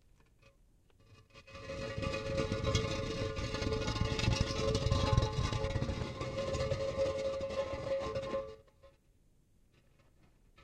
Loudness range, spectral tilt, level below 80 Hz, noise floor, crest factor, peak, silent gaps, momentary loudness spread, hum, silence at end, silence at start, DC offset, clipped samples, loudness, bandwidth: 5 LU; -5.5 dB/octave; -46 dBFS; -68 dBFS; 22 dB; -14 dBFS; none; 9 LU; none; 0 s; 1.1 s; under 0.1%; under 0.1%; -36 LUFS; 12 kHz